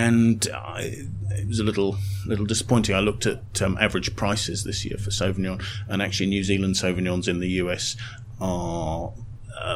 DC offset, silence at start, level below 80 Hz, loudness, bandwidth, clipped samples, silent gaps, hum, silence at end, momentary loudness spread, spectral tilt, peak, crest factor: under 0.1%; 0 s; -42 dBFS; -25 LUFS; 15.5 kHz; under 0.1%; none; none; 0 s; 10 LU; -4.5 dB/octave; -2 dBFS; 22 dB